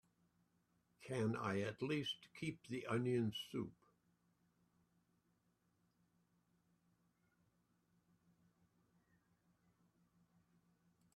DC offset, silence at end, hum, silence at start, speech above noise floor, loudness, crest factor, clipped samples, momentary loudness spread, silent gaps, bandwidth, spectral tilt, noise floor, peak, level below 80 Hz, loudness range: under 0.1%; 7.45 s; none; 1 s; 39 dB; -44 LUFS; 22 dB; under 0.1%; 9 LU; none; 13 kHz; -6 dB/octave; -82 dBFS; -28 dBFS; -82 dBFS; 10 LU